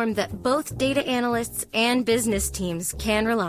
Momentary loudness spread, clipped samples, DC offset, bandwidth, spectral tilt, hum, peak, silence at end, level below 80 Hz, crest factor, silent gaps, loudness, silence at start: 5 LU; under 0.1%; under 0.1%; 16 kHz; -3.5 dB/octave; none; -10 dBFS; 0 s; -42 dBFS; 14 dB; none; -24 LUFS; 0 s